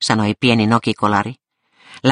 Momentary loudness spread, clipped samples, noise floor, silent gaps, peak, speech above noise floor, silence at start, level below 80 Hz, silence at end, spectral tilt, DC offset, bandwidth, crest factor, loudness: 6 LU; under 0.1%; -51 dBFS; none; 0 dBFS; 35 dB; 0 s; -54 dBFS; 0 s; -5 dB/octave; under 0.1%; 10.5 kHz; 16 dB; -16 LUFS